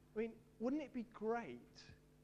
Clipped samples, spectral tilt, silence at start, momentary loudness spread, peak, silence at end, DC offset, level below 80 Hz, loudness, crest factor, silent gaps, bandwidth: under 0.1%; -6.5 dB/octave; 0.15 s; 18 LU; -30 dBFS; 0.3 s; under 0.1%; -74 dBFS; -45 LUFS; 16 dB; none; 10.5 kHz